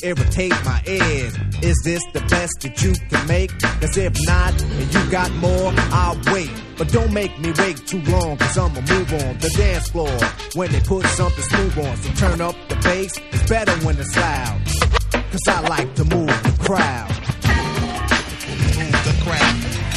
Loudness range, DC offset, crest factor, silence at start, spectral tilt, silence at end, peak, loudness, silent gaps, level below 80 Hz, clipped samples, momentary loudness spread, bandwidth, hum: 1 LU; under 0.1%; 18 dB; 0 s; -5 dB/octave; 0 s; 0 dBFS; -19 LUFS; none; -24 dBFS; under 0.1%; 5 LU; 14 kHz; none